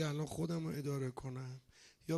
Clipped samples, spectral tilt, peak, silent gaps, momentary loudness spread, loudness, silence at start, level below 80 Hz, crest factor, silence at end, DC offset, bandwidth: under 0.1%; -6.5 dB/octave; -26 dBFS; none; 12 LU; -42 LUFS; 0 s; -68 dBFS; 16 dB; 0 s; under 0.1%; 12.5 kHz